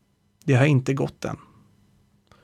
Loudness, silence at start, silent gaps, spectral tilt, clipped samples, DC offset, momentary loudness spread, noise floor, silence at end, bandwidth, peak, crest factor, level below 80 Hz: -23 LUFS; 0.45 s; none; -7 dB/octave; under 0.1%; under 0.1%; 15 LU; -61 dBFS; 1.1 s; 10 kHz; -8 dBFS; 18 dB; -58 dBFS